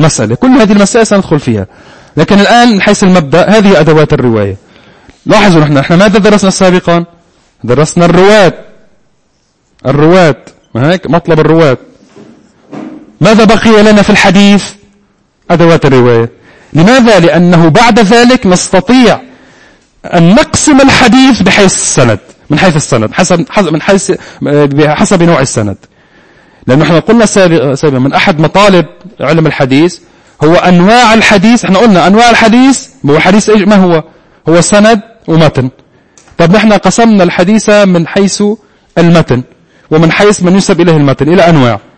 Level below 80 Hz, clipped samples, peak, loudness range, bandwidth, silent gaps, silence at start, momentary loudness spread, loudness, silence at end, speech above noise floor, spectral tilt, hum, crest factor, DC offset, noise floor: -32 dBFS; 5%; 0 dBFS; 4 LU; 11 kHz; none; 0 s; 9 LU; -5 LUFS; 0.1 s; 48 dB; -5 dB/octave; none; 6 dB; 3%; -53 dBFS